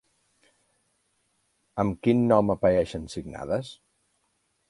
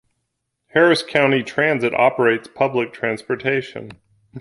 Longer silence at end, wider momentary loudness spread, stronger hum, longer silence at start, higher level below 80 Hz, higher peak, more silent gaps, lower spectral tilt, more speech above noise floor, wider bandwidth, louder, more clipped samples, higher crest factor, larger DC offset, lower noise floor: first, 0.95 s vs 0 s; first, 16 LU vs 8 LU; neither; first, 1.75 s vs 0.75 s; first, -52 dBFS vs -62 dBFS; second, -6 dBFS vs 0 dBFS; neither; first, -7.5 dB/octave vs -5.5 dB/octave; second, 49 dB vs 57 dB; about the same, 11.5 kHz vs 11.5 kHz; second, -25 LUFS vs -18 LUFS; neither; about the same, 22 dB vs 18 dB; neither; about the same, -73 dBFS vs -75 dBFS